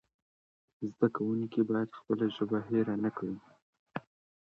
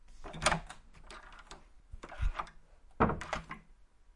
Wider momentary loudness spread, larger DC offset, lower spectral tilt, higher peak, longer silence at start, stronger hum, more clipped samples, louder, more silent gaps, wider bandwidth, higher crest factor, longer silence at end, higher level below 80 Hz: second, 14 LU vs 21 LU; neither; first, -9 dB/octave vs -4 dB/octave; about the same, -12 dBFS vs -10 dBFS; first, 0.8 s vs 0.05 s; neither; neither; about the same, -33 LUFS vs -35 LUFS; first, 3.62-3.73 s, 3.79-3.86 s vs none; second, 5.6 kHz vs 11.5 kHz; second, 22 dB vs 30 dB; first, 0.5 s vs 0.05 s; second, -74 dBFS vs -46 dBFS